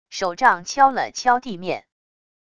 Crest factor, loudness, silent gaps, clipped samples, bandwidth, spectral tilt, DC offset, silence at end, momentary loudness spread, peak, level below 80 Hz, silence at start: 20 dB; -20 LUFS; none; under 0.1%; 11 kHz; -3 dB/octave; 0.4%; 0.8 s; 11 LU; -2 dBFS; -60 dBFS; 0.1 s